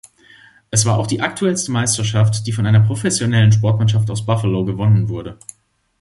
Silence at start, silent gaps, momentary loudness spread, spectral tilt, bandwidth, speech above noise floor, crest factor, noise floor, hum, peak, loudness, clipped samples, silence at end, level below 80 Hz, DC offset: 0.7 s; none; 6 LU; -5 dB/octave; 11.5 kHz; 32 dB; 16 dB; -47 dBFS; none; 0 dBFS; -16 LUFS; under 0.1%; 0.65 s; -44 dBFS; under 0.1%